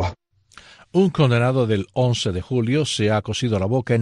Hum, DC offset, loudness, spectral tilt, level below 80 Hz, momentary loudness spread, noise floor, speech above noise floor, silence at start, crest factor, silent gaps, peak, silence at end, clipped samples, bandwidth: none; under 0.1%; -20 LUFS; -6 dB/octave; -48 dBFS; 6 LU; -50 dBFS; 31 dB; 0 s; 16 dB; none; -4 dBFS; 0 s; under 0.1%; 11 kHz